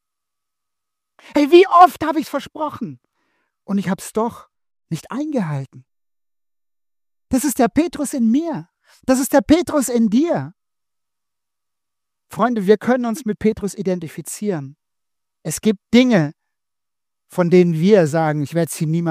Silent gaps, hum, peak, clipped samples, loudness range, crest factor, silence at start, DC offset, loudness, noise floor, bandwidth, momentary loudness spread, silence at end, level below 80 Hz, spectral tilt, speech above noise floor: none; none; 0 dBFS; under 0.1%; 9 LU; 20 dB; 1.35 s; under 0.1%; -18 LUFS; under -90 dBFS; 15.5 kHz; 15 LU; 0 s; -52 dBFS; -6 dB/octave; over 73 dB